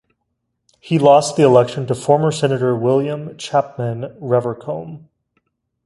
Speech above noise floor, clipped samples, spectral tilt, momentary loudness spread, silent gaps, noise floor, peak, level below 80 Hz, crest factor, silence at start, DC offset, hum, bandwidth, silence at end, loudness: 57 dB; under 0.1%; -6.5 dB/octave; 15 LU; none; -73 dBFS; 0 dBFS; -58 dBFS; 18 dB; 0.85 s; under 0.1%; none; 11.5 kHz; 0.9 s; -17 LUFS